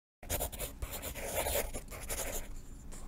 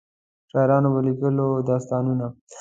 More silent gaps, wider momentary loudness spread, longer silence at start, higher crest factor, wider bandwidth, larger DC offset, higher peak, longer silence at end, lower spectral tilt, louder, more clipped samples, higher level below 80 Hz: second, none vs 2.41-2.47 s; first, 13 LU vs 9 LU; second, 0.2 s vs 0.55 s; about the same, 20 dB vs 16 dB; first, 16 kHz vs 7.8 kHz; neither; second, -20 dBFS vs -6 dBFS; about the same, 0 s vs 0 s; second, -2.5 dB/octave vs -9.5 dB/octave; second, -38 LUFS vs -22 LUFS; neither; first, -44 dBFS vs -62 dBFS